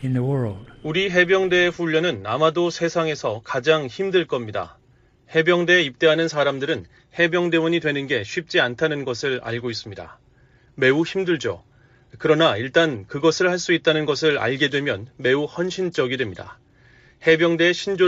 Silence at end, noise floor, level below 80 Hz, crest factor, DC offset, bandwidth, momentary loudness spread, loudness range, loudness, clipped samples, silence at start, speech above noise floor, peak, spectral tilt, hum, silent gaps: 0 s; -56 dBFS; -58 dBFS; 16 dB; under 0.1%; 8 kHz; 10 LU; 4 LU; -21 LUFS; under 0.1%; 0 s; 35 dB; -4 dBFS; -5 dB/octave; none; none